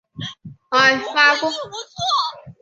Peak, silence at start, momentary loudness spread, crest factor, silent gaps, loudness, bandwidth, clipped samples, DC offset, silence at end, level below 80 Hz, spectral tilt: -2 dBFS; 0.15 s; 17 LU; 20 dB; none; -17 LUFS; 8.2 kHz; under 0.1%; under 0.1%; 0.1 s; -60 dBFS; -2.5 dB/octave